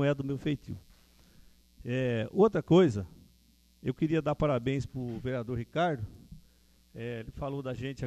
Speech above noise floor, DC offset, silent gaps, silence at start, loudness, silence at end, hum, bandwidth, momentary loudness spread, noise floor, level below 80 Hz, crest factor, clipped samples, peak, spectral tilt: 34 dB; under 0.1%; none; 0 s; -31 LUFS; 0 s; none; 13.5 kHz; 18 LU; -64 dBFS; -54 dBFS; 20 dB; under 0.1%; -10 dBFS; -8 dB/octave